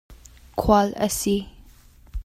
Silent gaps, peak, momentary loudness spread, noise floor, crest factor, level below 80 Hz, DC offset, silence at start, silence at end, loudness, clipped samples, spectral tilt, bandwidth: none; -4 dBFS; 19 LU; -50 dBFS; 20 dB; -38 dBFS; under 0.1%; 0.1 s; 0 s; -22 LUFS; under 0.1%; -5 dB/octave; 16 kHz